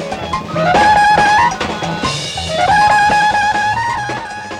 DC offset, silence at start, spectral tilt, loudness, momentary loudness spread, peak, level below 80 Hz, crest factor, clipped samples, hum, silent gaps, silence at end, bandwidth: under 0.1%; 0 s; -3.5 dB/octave; -13 LUFS; 11 LU; 0 dBFS; -38 dBFS; 12 dB; under 0.1%; none; none; 0 s; 12 kHz